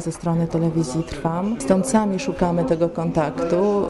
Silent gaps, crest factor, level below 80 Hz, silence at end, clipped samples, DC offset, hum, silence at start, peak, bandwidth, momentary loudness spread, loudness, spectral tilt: none; 16 dB; -44 dBFS; 0 s; under 0.1%; under 0.1%; none; 0 s; -6 dBFS; 12 kHz; 5 LU; -21 LUFS; -6.5 dB/octave